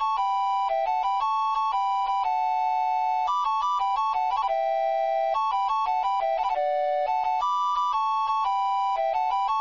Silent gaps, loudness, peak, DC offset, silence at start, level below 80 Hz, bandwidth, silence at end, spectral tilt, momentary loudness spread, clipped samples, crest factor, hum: none; -25 LUFS; -16 dBFS; 0.1%; 0 s; -60 dBFS; 7.4 kHz; 0 s; -0.5 dB/octave; 1 LU; under 0.1%; 8 dB; none